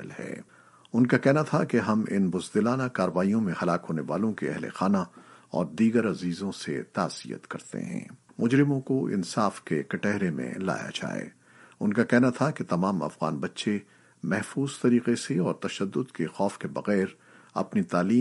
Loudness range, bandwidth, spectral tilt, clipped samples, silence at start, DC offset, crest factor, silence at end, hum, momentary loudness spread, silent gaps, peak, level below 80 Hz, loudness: 3 LU; 11.5 kHz; -6.5 dB/octave; under 0.1%; 0 s; under 0.1%; 22 dB; 0 s; none; 12 LU; none; -6 dBFS; -70 dBFS; -28 LUFS